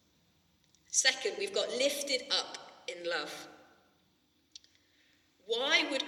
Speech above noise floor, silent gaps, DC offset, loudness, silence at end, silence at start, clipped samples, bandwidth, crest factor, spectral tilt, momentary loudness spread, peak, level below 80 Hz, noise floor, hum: 39 dB; none; under 0.1%; -31 LUFS; 0 s; 0.9 s; under 0.1%; 18.5 kHz; 24 dB; 0.5 dB/octave; 17 LU; -12 dBFS; -84 dBFS; -72 dBFS; none